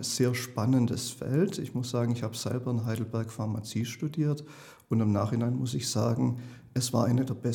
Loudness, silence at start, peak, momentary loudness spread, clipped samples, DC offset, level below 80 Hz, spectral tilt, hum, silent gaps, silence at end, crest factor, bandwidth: -30 LUFS; 0 s; -12 dBFS; 7 LU; under 0.1%; under 0.1%; -66 dBFS; -6 dB/octave; none; none; 0 s; 18 dB; 18 kHz